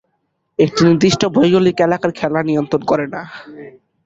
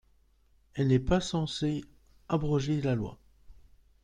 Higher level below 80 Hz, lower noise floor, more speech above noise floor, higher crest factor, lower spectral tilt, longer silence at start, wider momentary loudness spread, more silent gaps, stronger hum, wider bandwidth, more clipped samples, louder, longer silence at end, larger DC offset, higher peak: about the same, -50 dBFS vs -48 dBFS; about the same, -68 dBFS vs -65 dBFS; first, 54 dB vs 37 dB; about the same, 14 dB vs 18 dB; about the same, -6 dB/octave vs -6.5 dB/octave; second, 0.6 s vs 0.75 s; first, 16 LU vs 10 LU; neither; neither; second, 7.8 kHz vs 10 kHz; neither; first, -15 LUFS vs -30 LUFS; about the same, 0.35 s vs 0.45 s; neither; first, -2 dBFS vs -14 dBFS